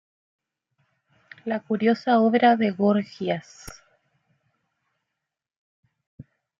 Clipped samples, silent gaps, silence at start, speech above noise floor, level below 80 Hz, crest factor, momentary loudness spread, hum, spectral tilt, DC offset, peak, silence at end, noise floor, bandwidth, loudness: under 0.1%; 5.56-5.83 s, 6.07-6.18 s; 1.45 s; 63 dB; -66 dBFS; 20 dB; 22 LU; none; -6.5 dB/octave; under 0.1%; -6 dBFS; 0.4 s; -85 dBFS; 12 kHz; -22 LUFS